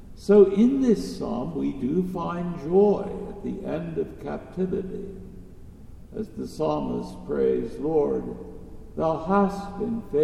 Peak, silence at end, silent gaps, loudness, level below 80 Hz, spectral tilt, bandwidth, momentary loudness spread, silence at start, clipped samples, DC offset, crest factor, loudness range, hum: -6 dBFS; 0 s; none; -25 LUFS; -46 dBFS; -8 dB/octave; 12 kHz; 17 LU; 0 s; under 0.1%; under 0.1%; 20 dB; 9 LU; none